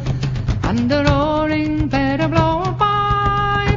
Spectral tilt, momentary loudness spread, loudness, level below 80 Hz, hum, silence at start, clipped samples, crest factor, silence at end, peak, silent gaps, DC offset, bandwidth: -7 dB/octave; 5 LU; -17 LUFS; -28 dBFS; none; 0 s; under 0.1%; 16 dB; 0 s; -2 dBFS; none; under 0.1%; 7.6 kHz